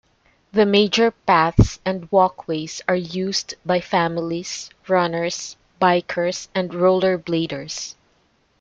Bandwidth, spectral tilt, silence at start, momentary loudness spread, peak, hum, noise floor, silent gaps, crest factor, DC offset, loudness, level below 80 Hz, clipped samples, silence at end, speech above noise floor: 8.8 kHz; -5 dB/octave; 0.55 s; 11 LU; -2 dBFS; none; -62 dBFS; none; 18 dB; under 0.1%; -20 LUFS; -38 dBFS; under 0.1%; 0.7 s; 42 dB